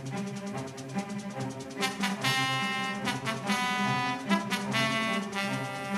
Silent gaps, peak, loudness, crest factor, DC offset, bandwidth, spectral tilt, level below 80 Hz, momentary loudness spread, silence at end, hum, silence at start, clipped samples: none; -10 dBFS; -30 LUFS; 20 dB; under 0.1%; 15 kHz; -4 dB/octave; -70 dBFS; 10 LU; 0 s; none; 0 s; under 0.1%